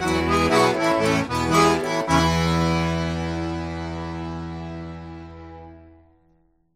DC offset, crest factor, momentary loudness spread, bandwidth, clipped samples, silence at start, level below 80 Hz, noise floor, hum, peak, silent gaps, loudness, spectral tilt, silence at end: under 0.1%; 18 dB; 20 LU; 15.5 kHz; under 0.1%; 0 s; -40 dBFS; -62 dBFS; none; -6 dBFS; none; -22 LUFS; -5 dB/octave; 0.9 s